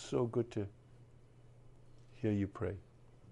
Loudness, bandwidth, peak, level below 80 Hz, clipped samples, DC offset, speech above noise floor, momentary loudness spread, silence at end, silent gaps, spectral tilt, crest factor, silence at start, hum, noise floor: -39 LUFS; 11 kHz; -22 dBFS; -66 dBFS; under 0.1%; under 0.1%; 23 dB; 10 LU; 0 s; none; -7.5 dB/octave; 18 dB; 0 s; none; -60 dBFS